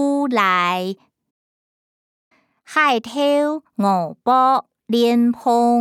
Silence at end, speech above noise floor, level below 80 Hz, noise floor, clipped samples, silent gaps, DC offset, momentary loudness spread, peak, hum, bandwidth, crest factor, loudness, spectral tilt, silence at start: 0 s; over 73 dB; -74 dBFS; under -90 dBFS; under 0.1%; 1.31-2.31 s; under 0.1%; 7 LU; -4 dBFS; none; 15 kHz; 16 dB; -18 LUFS; -5 dB/octave; 0 s